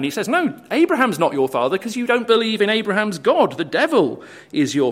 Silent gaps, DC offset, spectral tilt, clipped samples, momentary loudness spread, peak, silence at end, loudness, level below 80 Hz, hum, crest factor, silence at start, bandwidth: none; under 0.1%; -4.5 dB/octave; under 0.1%; 6 LU; -2 dBFS; 0 s; -18 LUFS; -66 dBFS; none; 18 dB; 0 s; 16 kHz